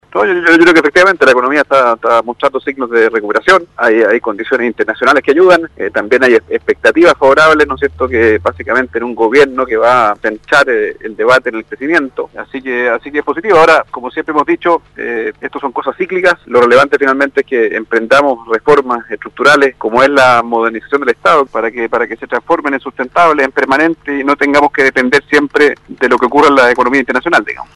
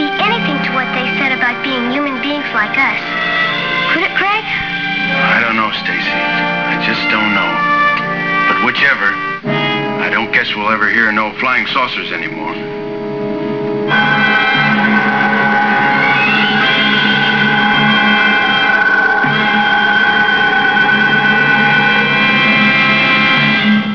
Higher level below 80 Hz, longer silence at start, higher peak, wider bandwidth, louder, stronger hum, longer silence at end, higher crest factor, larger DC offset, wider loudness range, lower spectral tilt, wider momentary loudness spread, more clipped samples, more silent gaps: first, -44 dBFS vs -50 dBFS; first, 0.15 s vs 0 s; about the same, 0 dBFS vs 0 dBFS; first, 12 kHz vs 5.4 kHz; about the same, -10 LUFS vs -12 LUFS; neither; about the same, 0.1 s vs 0 s; about the same, 10 dB vs 12 dB; second, under 0.1% vs 0.5%; about the same, 3 LU vs 4 LU; about the same, -4.5 dB/octave vs -5.5 dB/octave; first, 10 LU vs 7 LU; neither; neither